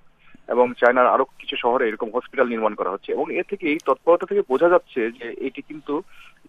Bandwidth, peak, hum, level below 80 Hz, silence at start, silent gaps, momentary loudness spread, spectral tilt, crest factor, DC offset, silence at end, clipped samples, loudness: 7.2 kHz; -4 dBFS; none; -60 dBFS; 0.3 s; none; 12 LU; -6 dB/octave; 18 dB; under 0.1%; 0.25 s; under 0.1%; -21 LUFS